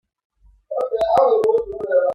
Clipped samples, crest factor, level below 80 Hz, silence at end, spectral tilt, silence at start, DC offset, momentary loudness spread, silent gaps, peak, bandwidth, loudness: under 0.1%; 16 dB; -52 dBFS; 0 s; -5.5 dB/octave; 0.7 s; under 0.1%; 10 LU; none; -4 dBFS; 10.5 kHz; -18 LUFS